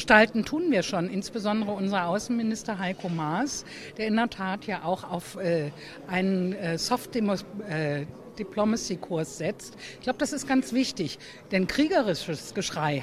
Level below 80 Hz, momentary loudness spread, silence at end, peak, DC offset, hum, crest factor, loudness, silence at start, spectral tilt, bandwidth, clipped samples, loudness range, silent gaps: -58 dBFS; 9 LU; 0 s; -2 dBFS; under 0.1%; none; 26 dB; -28 LUFS; 0 s; -5 dB/octave; 14.5 kHz; under 0.1%; 2 LU; none